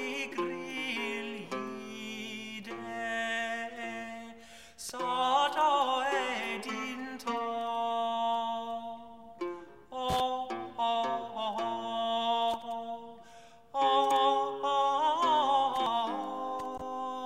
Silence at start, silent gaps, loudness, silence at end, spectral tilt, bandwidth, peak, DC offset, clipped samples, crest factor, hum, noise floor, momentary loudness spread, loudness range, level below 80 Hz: 0 s; none; -32 LUFS; 0 s; -3 dB/octave; 16 kHz; -14 dBFS; 0.1%; under 0.1%; 18 dB; none; -55 dBFS; 14 LU; 8 LU; -66 dBFS